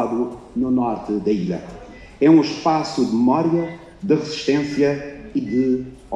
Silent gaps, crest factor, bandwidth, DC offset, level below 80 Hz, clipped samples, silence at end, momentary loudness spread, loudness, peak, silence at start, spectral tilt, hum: none; 16 dB; 9.4 kHz; under 0.1%; -50 dBFS; under 0.1%; 0 s; 13 LU; -20 LUFS; -4 dBFS; 0 s; -6.5 dB/octave; none